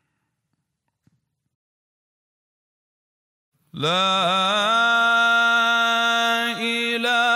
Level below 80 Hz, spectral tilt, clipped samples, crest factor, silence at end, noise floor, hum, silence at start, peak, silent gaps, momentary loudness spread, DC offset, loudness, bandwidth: -78 dBFS; -2.5 dB/octave; under 0.1%; 12 dB; 0 s; -77 dBFS; none; 3.75 s; -10 dBFS; none; 6 LU; under 0.1%; -18 LUFS; 16 kHz